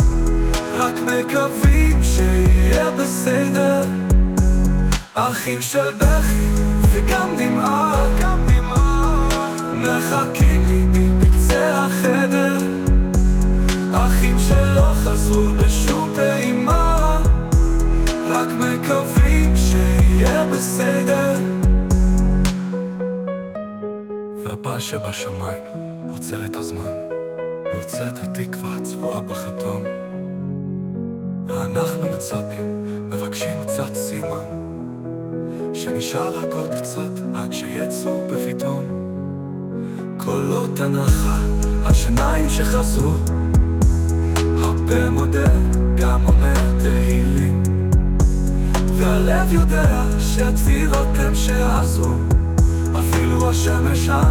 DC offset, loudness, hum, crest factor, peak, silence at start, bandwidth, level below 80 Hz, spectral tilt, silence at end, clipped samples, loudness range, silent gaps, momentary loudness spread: under 0.1%; -19 LUFS; none; 14 dB; -4 dBFS; 0 s; 18.5 kHz; -20 dBFS; -6 dB/octave; 0 s; under 0.1%; 10 LU; none; 11 LU